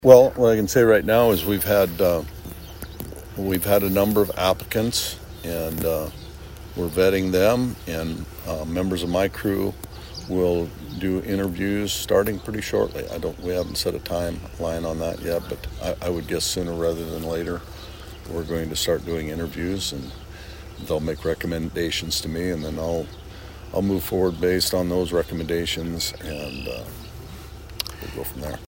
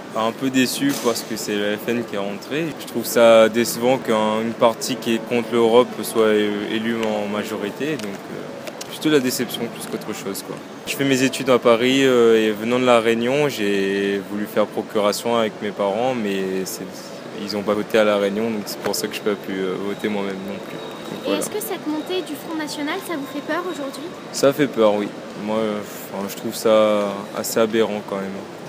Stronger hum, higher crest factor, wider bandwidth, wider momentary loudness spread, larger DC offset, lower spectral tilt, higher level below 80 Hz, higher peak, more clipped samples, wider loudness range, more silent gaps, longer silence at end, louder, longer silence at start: neither; about the same, 24 dB vs 20 dB; about the same, 16.5 kHz vs 16 kHz; first, 17 LU vs 13 LU; neither; about the same, -5 dB/octave vs -4 dB/octave; first, -40 dBFS vs -68 dBFS; about the same, 0 dBFS vs 0 dBFS; neither; second, 5 LU vs 8 LU; neither; about the same, 0 s vs 0 s; about the same, -23 LUFS vs -21 LUFS; about the same, 0 s vs 0 s